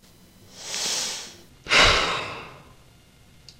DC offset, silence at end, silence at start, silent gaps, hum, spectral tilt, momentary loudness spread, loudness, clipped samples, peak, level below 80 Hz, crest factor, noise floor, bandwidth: under 0.1%; 1 s; 0.55 s; none; none; -1 dB/octave; 25 LU; -21 LUFS; under 0.1%; -4 dBFS; -42 dBFS; 24 dB; -53 dBFS; 16 kHz